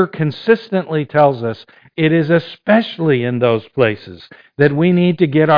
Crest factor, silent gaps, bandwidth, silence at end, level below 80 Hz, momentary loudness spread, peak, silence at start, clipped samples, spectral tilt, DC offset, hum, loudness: 14 dB; none; 5.2 kHz; 0 s; -54 dBFS; 11 LU; 0 dBFS; 0 s; under 0.1%; -9.5 dB/octave; under 0.1%; none; -15 LUFS